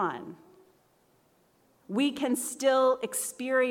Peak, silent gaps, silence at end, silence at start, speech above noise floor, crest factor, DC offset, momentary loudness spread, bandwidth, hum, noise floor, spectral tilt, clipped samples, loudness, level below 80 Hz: -14 dBFS; none; 0 s; 0 s; 38 dB; 16 dB; under 0.1%; 11 LU; 17.5 kHz; none; -66 dBFS; -3 dB/octave; under 0.1%; -28 LUFS; -78 dBFS